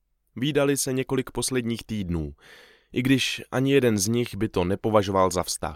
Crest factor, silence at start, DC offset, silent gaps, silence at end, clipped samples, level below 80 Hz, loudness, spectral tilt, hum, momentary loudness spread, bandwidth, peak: 18 dB; 0.35 s; under 0.1%; none; 0 s; under 0.1%; -48 dBFS; -25 LUFS; -4.5 dB/octave; none; 9 LU; 17 kHz; -6 dBFS